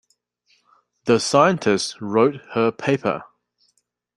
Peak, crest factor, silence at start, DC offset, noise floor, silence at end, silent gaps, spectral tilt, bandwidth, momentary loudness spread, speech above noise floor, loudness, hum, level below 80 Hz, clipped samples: -2 dBFS; 20 dB; 1.05 s; under 0.1%; -69 dBFS; 0.9 s; none; -5 dB/octave; 11.5 kHz; 8 LU; 50 dB; -20 LUFS; 60 Hz at -50 dBFS; -64 dBFS; under 0.1%